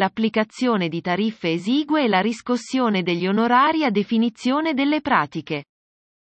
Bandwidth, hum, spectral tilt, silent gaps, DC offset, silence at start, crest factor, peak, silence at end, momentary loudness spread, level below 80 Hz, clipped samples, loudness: 8.6 kHz; none; -6 dB/octave; none; under 0.1%; 0 s; 18 dB; -4 dBFS; 0.7 s; 6 LU; -66 dBFS; under 0.1%; -21 LUFS